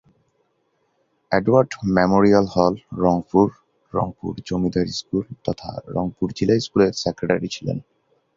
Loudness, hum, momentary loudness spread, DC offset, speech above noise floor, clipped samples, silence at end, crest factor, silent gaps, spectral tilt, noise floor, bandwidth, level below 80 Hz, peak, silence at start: -21 LUFS; none; 12 LU; under 0.1%; 48 dB; under 0.1%; 0.55 s; 20 dB; none; -6.5 dB/octave; -68 dBFS; 7.6 kHz; -48 dBFS; -2 dBFS; 1.3 s